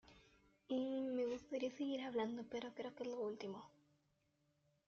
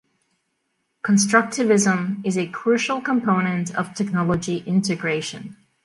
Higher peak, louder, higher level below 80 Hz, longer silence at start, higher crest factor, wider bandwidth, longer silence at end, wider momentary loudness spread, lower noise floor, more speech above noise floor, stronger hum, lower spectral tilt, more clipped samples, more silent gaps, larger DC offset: second, -30 dBFS vs -2 dBFS; second, -45 LUFS vs -21 LUFS; second, -82 dBFS vs -58 dBFS; second, 0.05 s vs 1.05 s; about the same, 16 dB vs 20 dB; second, 7.2 kHz vs 11.5 kHz; first, 1.2 s vs 0.3 s; about the same, 8 LU vs 9 LU; first, -82 dBFS vs -73 dBFS; second, 36 dB vs 52 dB; neither; about the same, -4 dB/octave vs -5 dB/octave; neither; neither; neither